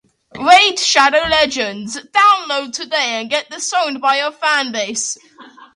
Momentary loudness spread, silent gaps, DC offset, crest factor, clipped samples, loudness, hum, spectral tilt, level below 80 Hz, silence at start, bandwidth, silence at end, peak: 11 LU; none; under 0.1%; 16 dB; under 0.1%; -14 LUFS; none; -0.5 dB/octave; -52 dBFS; 0.35 s; 11.5 kHz; 0.25 s; 0 dBFS